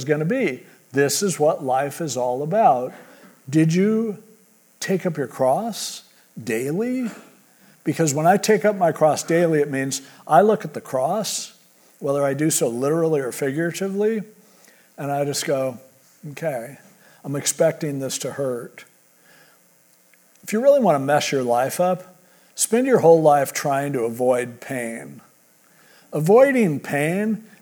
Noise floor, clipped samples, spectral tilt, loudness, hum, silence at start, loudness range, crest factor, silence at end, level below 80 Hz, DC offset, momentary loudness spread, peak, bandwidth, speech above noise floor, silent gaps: -57 dBFS; under 0.1%; -5 dB/octave; -21 LUFS; none; 0 s; 7 LU; 20 dB; 0.15 s; -80 dBFS; under 0.1%; 14 LU; -2 dBFS; over 20 kHz; 36 dB; none